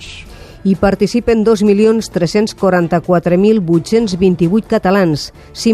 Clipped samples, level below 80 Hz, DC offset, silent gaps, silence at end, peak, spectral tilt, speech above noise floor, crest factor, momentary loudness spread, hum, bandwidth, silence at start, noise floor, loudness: under 0.1%; -38 dBFS; under 0.1%; none; 0 s; 0 dBFS; -6.5 dB/octave; 21 dB; 12 dB; 7 LU; none; 13 kHz; 0 s; -33 dBFS; -13 LUFS